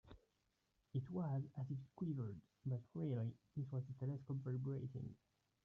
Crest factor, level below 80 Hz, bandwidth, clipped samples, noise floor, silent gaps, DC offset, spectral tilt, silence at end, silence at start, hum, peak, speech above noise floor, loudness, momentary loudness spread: 14 dB; -76 dBFS; 3.9 kHz; under 0.1%; -85 dBFS; none; under 0.1%; -11 dB/octave; 0.5 s; 0.05 s; none; -32 dBFS; 39 dB; -47 LUFS; 7 LU